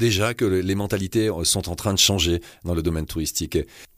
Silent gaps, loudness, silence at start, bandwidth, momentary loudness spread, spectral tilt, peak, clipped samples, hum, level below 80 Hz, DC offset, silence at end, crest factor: none; -22 LUFS; 0 s; 15.5 kHz; 9 LU; -4 dB/octave; -6 dBFS; under 0.1%; none; -38 dBFS; under 0.1%; 0.1 s; 16 dB